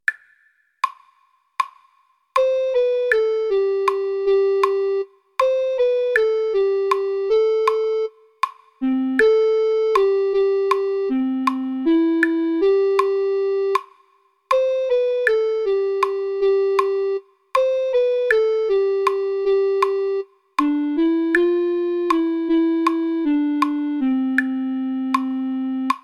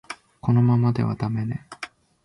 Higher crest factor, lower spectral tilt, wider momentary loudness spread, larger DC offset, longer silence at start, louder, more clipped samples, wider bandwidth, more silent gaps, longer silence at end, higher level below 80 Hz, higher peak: about the same, 18 dB vs 14 dB; second, -4 dB/octave vs -8.5 dB/octave; second, 7 LU vs 19 LU; neither; about the same, 0.1 s vs 0.1 s; first, -20 LUFS vs -23 LUFS; neither; first, 12.5 kHz vs 11 kHz; neither; second, 0.05 s vs 0.4 s; about the same, -58 dBFS vs -54 dBFS; first, -2 dBFS vs -8 dBFS